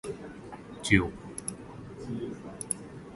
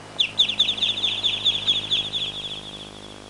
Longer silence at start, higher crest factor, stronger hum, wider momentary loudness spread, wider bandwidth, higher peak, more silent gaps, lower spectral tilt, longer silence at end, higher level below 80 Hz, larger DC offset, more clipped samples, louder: about the same, 0.05 s vs 0 s; first, 30 dB vs 16 dB; neither; first, 19 LU vs 15 LU; about the same, 12 kHz vs 11.5 kHz; first, -4 dBFS vs -8 dBFS; neither; first, -4.5 dB/octave vs -1.5 dB/octave; about the same, 0 s vs 0 s; first, -50 dBFS vs -56 dBFS; second, under 0.1% vs 0.1%; neither; second, -32 LUFS vs -21 LUFS